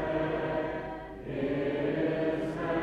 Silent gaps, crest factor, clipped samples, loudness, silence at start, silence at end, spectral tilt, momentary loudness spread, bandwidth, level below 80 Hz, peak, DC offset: none; 14 dB; under 0.1%; -32 LUFS; 0 s; 0 s; -8 dB/octave; 9 LU; 9.6 kHz; -52 dBFS; -18 dBFS; under 0.1%